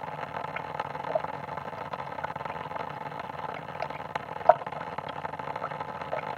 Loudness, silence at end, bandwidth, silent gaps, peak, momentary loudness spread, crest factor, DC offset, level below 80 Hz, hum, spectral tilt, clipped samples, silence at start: -33 LUFS; 0 s; 14 kHz; none; -2 dBFS; 12 LU; 32 dB; under 0.1%; -64 dBFS; none; -6 dB/octave; under 0.1%; 0 s